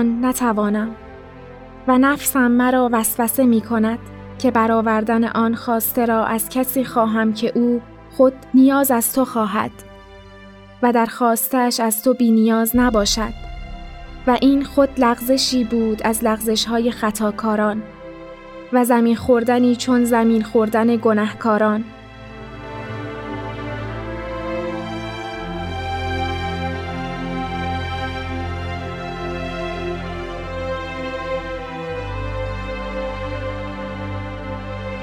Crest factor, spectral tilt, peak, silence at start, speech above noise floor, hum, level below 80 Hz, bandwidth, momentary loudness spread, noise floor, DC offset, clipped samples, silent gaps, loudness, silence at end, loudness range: 16 dB; -4.5 dB/octave; -2 dBFS; 0 s; 24 dB; none; -38 dBFS; 19 kHz; 13 LU; -41 dBFS; under 0.1%; under 0.1%; none; -19 LUFS; 0 s; 9 LU